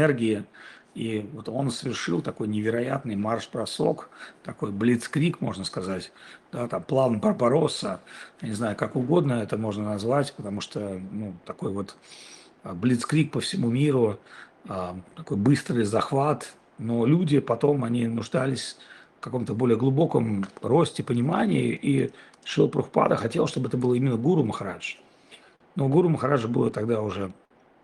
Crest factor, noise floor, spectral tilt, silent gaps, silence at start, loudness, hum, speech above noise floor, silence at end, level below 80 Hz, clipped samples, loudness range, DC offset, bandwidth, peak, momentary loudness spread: 20 dB; -53 dBFS; -6.5 dB/octave; none; 0 s; -26 LUFS; none; 28 dB; 0.5 s; -64 dBFS; under 0.1%; 4 LU; under 0.1%; 12 kHz; -6 dBFS; 14 LU